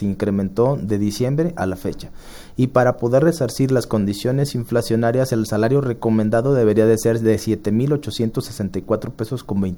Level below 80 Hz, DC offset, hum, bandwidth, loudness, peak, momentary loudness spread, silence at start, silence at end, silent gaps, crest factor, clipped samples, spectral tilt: -44 dBFS; under 0.1%; none; over 20 kHz; -19 LUFS; -2 dBFS; 9 LU; 0 s; 0 s; none; 16 dB; under 0.1%; -7 dB/octave